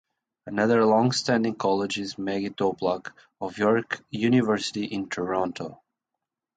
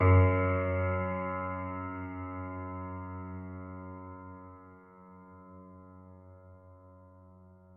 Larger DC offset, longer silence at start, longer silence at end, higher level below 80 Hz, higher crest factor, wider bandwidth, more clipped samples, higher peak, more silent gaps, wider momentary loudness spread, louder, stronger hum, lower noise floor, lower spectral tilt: neither; first, 0.45 s vs 0 s; first, 0.8 s vs 0 s; about the same, -64 dBFS vs -64 dBFS; about the same, 18 dB vs 20 dB; first, 9.4 kHz vs 3.2 kHz; neither; first, -8 dBFS vs -12 dBFS; neither; second, 12 LU vs 25 LU; first, -25 LUFS vs -33 LUFS; neither; first, -86 dBFS vs -56 dBFS; second, -5.5 dB/octave vs -8.5 dB/octave